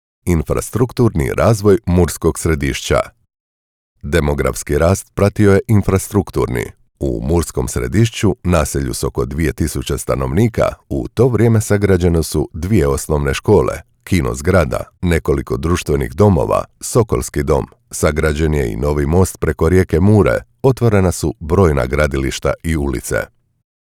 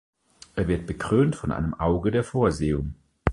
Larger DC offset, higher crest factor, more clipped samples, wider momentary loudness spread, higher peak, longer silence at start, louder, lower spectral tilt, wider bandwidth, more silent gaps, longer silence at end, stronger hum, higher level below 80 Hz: neither; second, 14 dB vs 24 dB; neither; about the same, 7 LU vs 8 LU; about the same, -2 dBFS vs -2 dBFS; second, 0.25 s vs 0.55 s; first, -16 LUFS vs -25 LUFS; about the same, -6.5 dB/octave vs -7.5 dB/octave; first, 17.5 kHz vs 11.5 kHz; first, 3.40-3.96 s vs none; first, 0.65 s vs 0 s; neither; first, -28 dBFS vs -38 dBFS